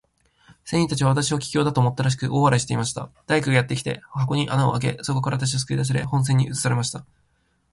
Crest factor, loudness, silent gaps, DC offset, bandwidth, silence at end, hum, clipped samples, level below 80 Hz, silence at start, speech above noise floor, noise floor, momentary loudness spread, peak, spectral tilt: 18 dB; -22 LUFS; none; under 0.1%; 11.5 kHz; 0.7 s; none; under 0.1%; -52 dBFS; 0.65 s; 44 dB; -66 dBFS; 7 LU; -4 dBFS; -5 dB/octave